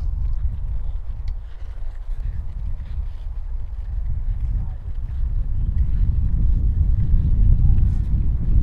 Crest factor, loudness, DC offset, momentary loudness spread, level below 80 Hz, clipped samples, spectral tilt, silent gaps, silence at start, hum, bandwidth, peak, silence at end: 16 dB; -25 LUFS; under 0.1%; 13 LU; -20 dBFS; under 0.1%; -10.5 dB/octave; none; 0 s; none; 2.3 kHz; -4 dBFS; 0 s